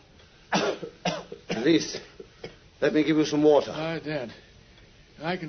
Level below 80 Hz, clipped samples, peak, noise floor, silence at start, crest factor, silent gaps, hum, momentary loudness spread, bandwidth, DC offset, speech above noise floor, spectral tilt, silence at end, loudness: -60 dBFS; under 0.1%; -8 dBFS; -54 dBFS; 0.5 s; 18 dB; none; none; 22 LU; 6.6 kHz; under 0.1%; 30 dB; -5 dB/octave; 0 s; -26 LUFS